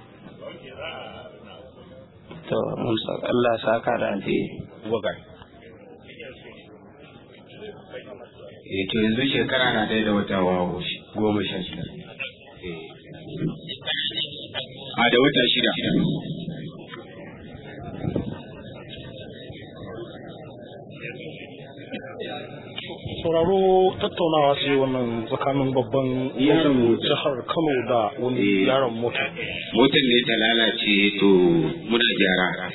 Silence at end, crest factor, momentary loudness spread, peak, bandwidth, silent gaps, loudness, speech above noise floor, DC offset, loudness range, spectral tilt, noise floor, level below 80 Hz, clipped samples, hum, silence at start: 0 s; 20 dB; 22 LU; -4 dBFS; 4.1 kHz; none; -22 LUFS; 25 dB; under 0.1%; 16 LU; -9 dB/octave; -46 dBFS; -54 dBFS; under 0.1%; none; 0 s